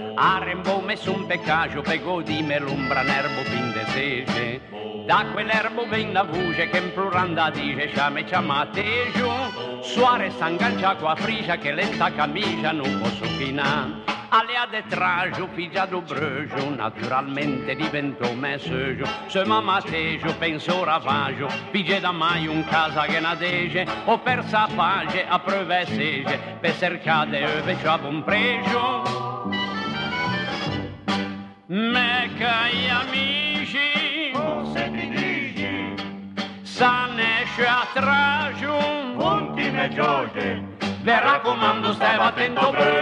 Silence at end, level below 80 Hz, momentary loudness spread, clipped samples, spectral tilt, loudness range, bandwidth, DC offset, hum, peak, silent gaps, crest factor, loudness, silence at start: 0 s; -54 dBFS; 7 LU; under 0.1%; -5 dB/octave; 3 LU; 10.5 kHz; under 0.1%; none; -6 dBFS; none; 16 dB; -23 LUFS; 0 s